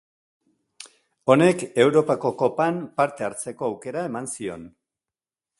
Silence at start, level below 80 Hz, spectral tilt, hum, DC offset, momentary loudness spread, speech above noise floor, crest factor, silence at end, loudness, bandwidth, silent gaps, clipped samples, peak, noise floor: 0.8 s; -66 dBFS; -5.5 dB/octave; none; under 0.1%; 13 LU; over 68 dB; 22 dB; 0.9 s; -23 LUFS; 11.5 kHz; none; under 0.1%; -2 dBFS; under -90 dBFS